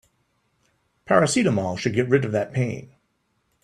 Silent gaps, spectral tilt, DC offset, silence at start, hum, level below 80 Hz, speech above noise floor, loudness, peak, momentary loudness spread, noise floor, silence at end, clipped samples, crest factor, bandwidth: none; -5.5 dB/octave; under 0.1%; 1.1 s; none; -60 dBFS; 49 dB; -22 LUFS; -4 dBFS; 8 LU; -70 dBFS; 0.8 s; under 0.1%; 20 dB; 12.5 kHz